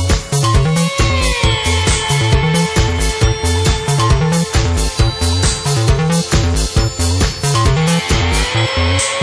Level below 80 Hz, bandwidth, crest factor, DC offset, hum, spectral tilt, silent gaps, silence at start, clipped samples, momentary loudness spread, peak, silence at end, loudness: -20 dBFS; 11 kHz; 12 dB; under 0.1%; none; -4.5 dB/octave; none; 0 s; under 0.1%; 2 LU; -2 dBFS; 0 s; -14 LUFS